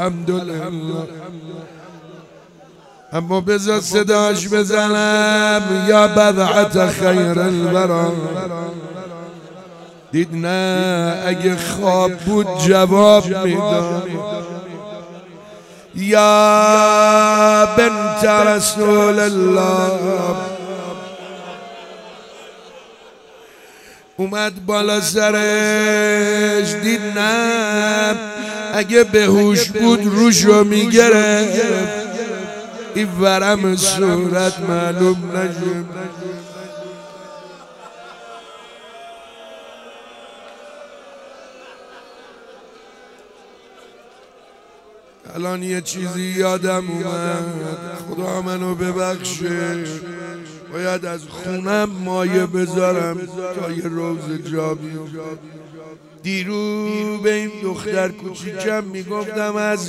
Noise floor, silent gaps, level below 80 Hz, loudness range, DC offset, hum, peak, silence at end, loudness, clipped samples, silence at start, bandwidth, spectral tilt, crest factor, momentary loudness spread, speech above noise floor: -46 dBFS; none; -54 dBFS; 14 LU; under 0.1%; none; 0 dBFS; 0 s; -16 LUFS; under 0.1%; 0 s; 16 kHz; -4.5 dB/octave; 18 dB; 21 LU; 30 dB